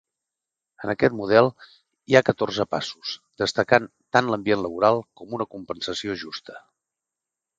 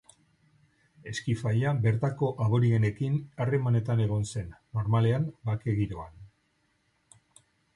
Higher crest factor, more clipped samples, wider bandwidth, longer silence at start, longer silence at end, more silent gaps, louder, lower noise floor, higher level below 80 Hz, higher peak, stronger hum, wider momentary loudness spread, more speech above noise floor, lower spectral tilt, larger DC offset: first, 24 dB vs 14 dB; neither; second, 9.2 kHz vs 11 kHz; second, 0.8 s vs 1.05 s; second, 1 s vs 1.5 s; neither; first, -23 LUFS vs -28 LUFS; first, -87 dBFS vs -72 dBFS; second, -60 dBFS vs -54 dBFS; first, 0 dBFS vs -14 dBFS; neither; first, 14 LU vs 11 LU; first, 64 dB vs 45 dB; second, -5 dB/octave vs -7.5 dB/octave; neither